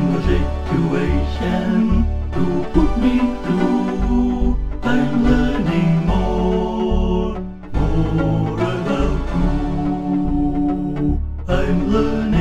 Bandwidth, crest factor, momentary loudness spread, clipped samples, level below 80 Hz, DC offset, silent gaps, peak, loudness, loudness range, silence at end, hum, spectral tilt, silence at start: 9 kHz; 16 dB; 5 LU; under 0.1%; -22 dBFS; 1%; none; 0 dBFS; -19 LUFS; 2 LU; 0 s; none; -8 dB/octave; 0 s